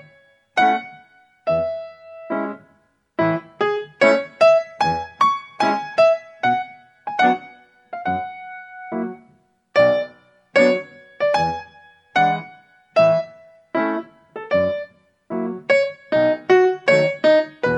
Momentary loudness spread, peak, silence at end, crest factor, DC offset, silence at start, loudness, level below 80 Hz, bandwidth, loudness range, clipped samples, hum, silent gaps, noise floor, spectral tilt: 17 LU; -2 dBFS; 0 s; 18 dB; under 0.1%; 0.55 s; -20 LUFS; -60 dBFS; 9.8 kHz; 6 LU; under 0.1%; none; none; -60 dBFS; -5.5 dB/octave